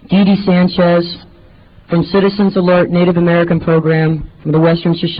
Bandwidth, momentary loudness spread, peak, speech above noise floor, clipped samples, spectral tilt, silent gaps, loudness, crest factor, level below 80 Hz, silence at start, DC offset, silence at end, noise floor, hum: 5.2 kHz; 6 LU; -2 dBFS; 30 dB; under 0.1%; -11.5 dB/octave; none; -12 LUFS; 10 dB; -40 dBFS; 0.1 s; 0.2%; 0 s; -42 dBFS; none